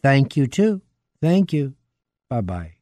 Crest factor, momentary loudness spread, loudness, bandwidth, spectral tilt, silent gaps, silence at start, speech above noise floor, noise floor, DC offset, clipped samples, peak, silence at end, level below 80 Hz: 16 dB; 12 LU; -21 LUFS; 10 kHz; -7.5 dB/octave; none; 0.05 s; 57 dB; -76 dBFS; under 0.1%; under 0.1%; -4 dBFS; 0.1 s; -50 dBFS